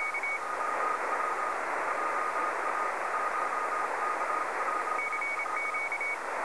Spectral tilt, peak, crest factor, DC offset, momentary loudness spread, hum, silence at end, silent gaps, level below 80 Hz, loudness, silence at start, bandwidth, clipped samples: -2 dB/octave; -18 dBFS; 14 dB; 0.3%; 1 LU; none; 0 s; none; -74 dBFS; -31 LUFS; 0 s; 11 kHz; under 0.1%